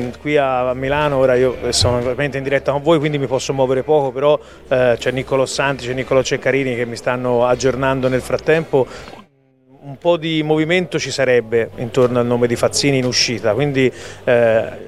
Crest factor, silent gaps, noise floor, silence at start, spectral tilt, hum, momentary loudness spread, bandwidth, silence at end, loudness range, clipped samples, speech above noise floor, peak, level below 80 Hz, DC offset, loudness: 14 dB; none; -53 dBFS; 0 s; -4.5 dB/octave; none; 5 LU; 13.5 kHz; 0 s; 3 LU; under 0.1%; 36 dB; -2 dBFS; -42 dBFS; 0.4%; -17 LUFS